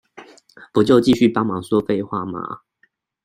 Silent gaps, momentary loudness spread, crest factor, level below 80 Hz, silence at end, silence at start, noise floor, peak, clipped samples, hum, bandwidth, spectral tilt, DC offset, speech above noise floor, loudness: none; 15 LU; 18 dB; -56 dBFS; 0.65 s; 0.15 s; -63 dBFS; -2 dBFS; under 0.1%; none; 14 kHz; -7 dB/octave; under 0.1%; 46 dB; -18 LUFS